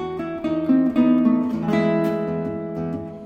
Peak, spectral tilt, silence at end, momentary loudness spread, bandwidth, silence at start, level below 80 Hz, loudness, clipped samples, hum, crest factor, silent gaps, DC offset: -8 dBFS; -8.5 dB/octave; 0 s; 11 LU; 6.8 kHz; 0 s; -54 dBFS; -21 LUFS; under 0.1%; none; 14 dB; none; under 0.1%